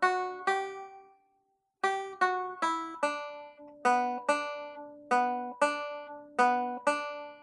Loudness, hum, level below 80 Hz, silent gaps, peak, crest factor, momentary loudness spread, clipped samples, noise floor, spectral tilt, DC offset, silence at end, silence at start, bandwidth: -31 LUFS; none; -84 dBFS; none; -12 dBFS; 20 dB; 15 LU; under 0.1%; -75 dBFS; -2.5 dB/octave; under 0.1%; 0 s; 0 s; 11.5 kHz